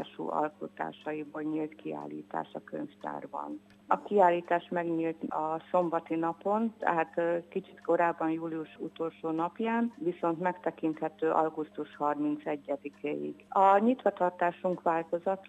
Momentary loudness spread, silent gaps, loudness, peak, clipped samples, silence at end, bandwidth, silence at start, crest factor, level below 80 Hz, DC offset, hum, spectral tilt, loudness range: 14 LU; none; -32 LUFS; -10 dBFS; under 0.1%; 0.05 s; 9 kHz; 0 s; 20 dB; -80 dBFS; under 0.1%; none; -8 dB/octave; 5 LU